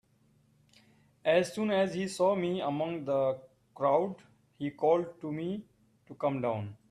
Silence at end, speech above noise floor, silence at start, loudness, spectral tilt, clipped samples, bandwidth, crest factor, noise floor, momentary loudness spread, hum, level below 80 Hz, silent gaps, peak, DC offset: 0.15 s; 37 dB; 1.25 s; -31 LUFS; -6 dB/octave; under 0.1%; 13 kHz; 20 dB; -68 dBFS; 10 LU; none; -74 dBFS; none; -14 dBFS; under 0.1%